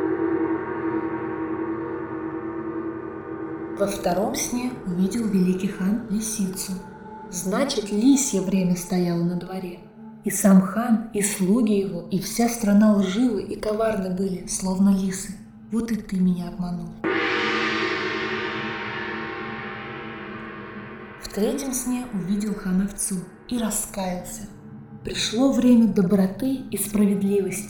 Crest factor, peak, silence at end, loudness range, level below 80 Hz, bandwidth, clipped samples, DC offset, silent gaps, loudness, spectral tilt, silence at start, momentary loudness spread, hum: 16 dB; -8 dBFS; 0 s; 7 LU; -50 dBFS; 19.5 kHz; under 0.1%; under 0.1%; none; -24 LUFS; -5 dB/octave; 0 s; 15 LU; none